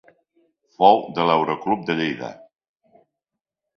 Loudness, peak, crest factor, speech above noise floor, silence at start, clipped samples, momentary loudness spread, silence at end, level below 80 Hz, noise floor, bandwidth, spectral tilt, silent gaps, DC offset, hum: -20 LUFS; 0 dBFS; 22 dB; 65 dB; 0.8 s; under 0.1%; 12 LU; 1.4 s; -64 dBFS; -85 dBFS; 6.4 kHz; -6.5 dB/octave; none; under 0.1%; none